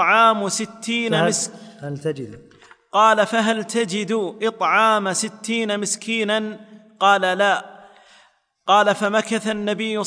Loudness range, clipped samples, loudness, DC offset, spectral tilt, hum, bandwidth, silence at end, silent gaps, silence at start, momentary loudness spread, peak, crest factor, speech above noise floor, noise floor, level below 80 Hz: 2 LU; under 0.1%; -19 LUFS; under 0.1%; -3 dB/octave; none; 10.5 kHz; 0 s; none; 0 s; 12 LU; -4 dBFS; 16 dB; 38 dB; -57 dBFS; -70 dBFS